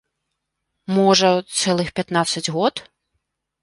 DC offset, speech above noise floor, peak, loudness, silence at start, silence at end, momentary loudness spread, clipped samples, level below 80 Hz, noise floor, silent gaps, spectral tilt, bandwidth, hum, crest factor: under 0.1%; 59 dB; -2 dBFS; -19 LUFS; 0.9 s; 0.8 s; 9 LU; under 0.1%; -58 dBFS; -78 dBFS; none; -4 dB/octave; 11.5 kHz; none; 18 dB